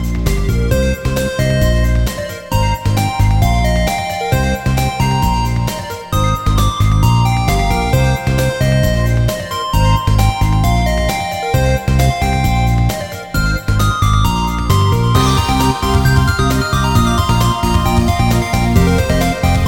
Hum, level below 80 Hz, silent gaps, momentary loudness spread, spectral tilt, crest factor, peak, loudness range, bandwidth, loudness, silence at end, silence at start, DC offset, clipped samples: none; -18 dBFS; none; 5 LU; -5.5 dB/octave; 14 dB; 0 dBFS; 2 LU; 17.5 kHz; -14 LUFS; 0 s; 0 s; under 0.1%; under 0.1%